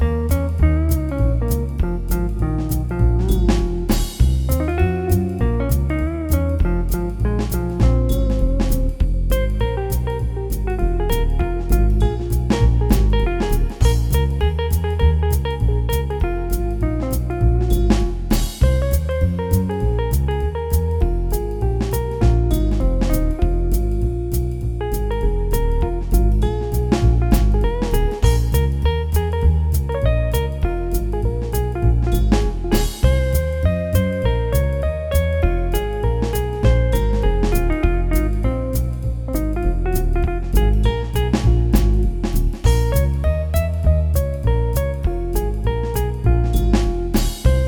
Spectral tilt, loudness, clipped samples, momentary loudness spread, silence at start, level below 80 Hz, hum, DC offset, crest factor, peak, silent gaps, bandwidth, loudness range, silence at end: -7 dB/octave; -20 LUFS; under 0.1%; 5 LU; 0 s; -20 dBFS; none; under 0.1%; 16 dB; 0 dBFS; none; over 20 kHz; 2 LU; 0 s